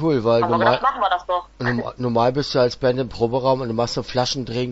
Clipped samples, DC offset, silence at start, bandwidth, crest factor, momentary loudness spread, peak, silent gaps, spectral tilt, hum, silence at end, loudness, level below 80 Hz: under 0.1%; under 0.1%; 0 s; 8 kHz; 18 dB; 6 LU; -2 dBFS; none; -5.5 dB/octave; none; 0 s; -20 LUFS; -46 dBFS